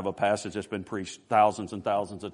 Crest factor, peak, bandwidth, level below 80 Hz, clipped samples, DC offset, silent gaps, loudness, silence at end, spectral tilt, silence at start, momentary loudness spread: 20 dB; -8 dBFS; 11 kHz; -68 dBFS; under 0.1%; under 0.1%; none; -28 LUFS; 0 s; -5 dB/octave; 0 s; 12 LU